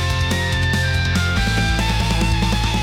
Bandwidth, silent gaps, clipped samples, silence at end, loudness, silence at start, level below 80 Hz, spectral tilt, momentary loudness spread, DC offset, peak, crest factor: 16.5 kHz; none; under 0.1%; 0 s; -18 LUFS; 0 s; -24 dBFS; -4.5 dB/octave; 1 LU; under 0.1%; -8 dBFS; 10 dB